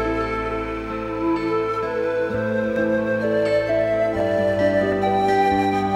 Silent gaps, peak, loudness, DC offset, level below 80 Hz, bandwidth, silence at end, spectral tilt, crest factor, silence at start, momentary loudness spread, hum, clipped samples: none; -8 dBFS; -21 LUFS; under 0.1%; -42 dBFS; 13.5 kHz; 0 s; -7 dB/octave; 12 dB; 0 s; 6 LU; none; under 0.1%